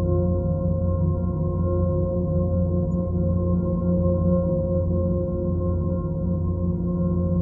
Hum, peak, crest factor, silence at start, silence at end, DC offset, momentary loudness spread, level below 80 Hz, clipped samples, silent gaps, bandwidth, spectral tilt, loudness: 60 Hz at -35 dBFS; -10 dBFS; 12 dB; 0 s; 0 s; under 0.1%; 3 LU; -34 dBFS; under 0.1%; none; 1.5 kHz; -15 dB/octave; -24 LUFS